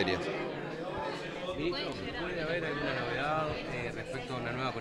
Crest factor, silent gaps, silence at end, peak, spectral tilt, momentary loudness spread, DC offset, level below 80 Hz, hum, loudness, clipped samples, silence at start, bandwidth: 20 dB; none; 0 s; -14 dBFS; -5.5 dB/octave; 6 LU; under 0.1%; -54 dBFS; none; -35 LUFS; under 0.1%; 0 s; 12.5 kHz